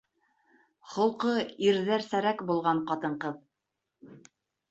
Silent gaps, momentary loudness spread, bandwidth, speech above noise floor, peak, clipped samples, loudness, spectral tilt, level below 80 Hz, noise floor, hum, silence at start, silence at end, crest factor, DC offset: none; 10 LU; 8 kHz; 56 dB; -12 dBFS; under 0.1%; -29 LUFS; -5.5 dB/octave; -76 dBFS; -85 dBFS; none; 0.85 s; 0.5 s; 18 dB; under 0.1%